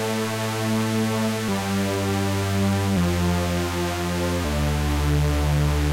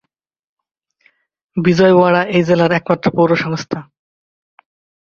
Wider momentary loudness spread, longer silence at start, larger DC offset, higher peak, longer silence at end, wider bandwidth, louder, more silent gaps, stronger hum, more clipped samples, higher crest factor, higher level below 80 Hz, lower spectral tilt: second, 3 LU vs 14 LU; second, 0 s vs 1.55 s; neither; second, -12 dBFS vs 0 dBFS; second, 0 s vs 1.2 s; first, 16 kHz vs 7 kHz; second, -23 LUFS vs -14 LUFS; neither; neither; neither; second, 10 dB vs 16 dB; first, -30 dBFS vs -54 dBFS; second, -5.5 dB/octave vs -7 dB/octave